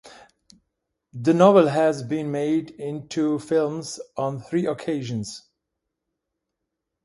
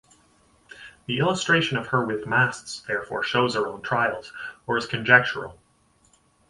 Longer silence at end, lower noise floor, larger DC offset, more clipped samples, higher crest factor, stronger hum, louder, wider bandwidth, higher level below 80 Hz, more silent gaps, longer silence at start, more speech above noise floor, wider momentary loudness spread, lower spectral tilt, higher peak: first, 1.65 s vs 0.95 s; first, -82 dBFS vs -62 dBFS; neither; neither; about the same, 22 dB vs 24 dB; neither; about the same, -23 LUFS vs -23 LUFS; about the same, 11.5 kHz vs 11.5 kHz; second, -66 dBFS vs -60 dBFS; neither; second, 0.05 s vs 0.75 s; first, 60 dB vs 38 dB; about the same, 17 LU vs 19 LU; first, -6.5 dB/octave vs -4.5 dB/octave; about the same, -2 dBFS vs 0 dBFS